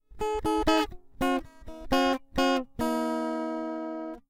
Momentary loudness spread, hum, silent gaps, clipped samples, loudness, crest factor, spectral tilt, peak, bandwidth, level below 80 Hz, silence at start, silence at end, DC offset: 9 LU; none; none; under 0.1%; -29 LUFS; 20 dB; -4.5 dB/octave; -10 dBFS; 17.5 kHz; -46 dBFS; 0.1 s; 0.1 s; under 0.1%